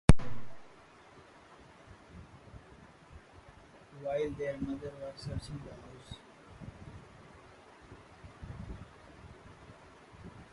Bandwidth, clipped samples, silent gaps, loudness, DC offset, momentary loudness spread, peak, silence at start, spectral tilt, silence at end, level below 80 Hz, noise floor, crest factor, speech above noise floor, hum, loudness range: 11.5 kHz; under 0.1%; none; -40 LUFS; under 0.1%; 20 LU; -4 dBFS; 0.1 s; -7 dB/octave; 0.1 s; -44 dBFS; -57 dBFS; 30 dB; 17 dB; none; 13 LU